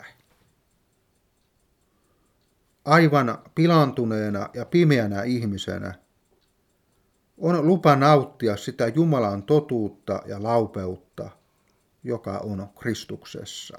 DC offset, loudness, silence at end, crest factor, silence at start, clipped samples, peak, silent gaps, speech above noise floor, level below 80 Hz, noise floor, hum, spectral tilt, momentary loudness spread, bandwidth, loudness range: under 0.1%; -23 LUFS; 0 s; 22 dB; 0.05 s; under 0.1%; -4 dBFS; none; 45 dB; -64 dBFS; -68 dBFS; none; -7 dB/octave; 18 LU; 14.5 kHz; 8 LU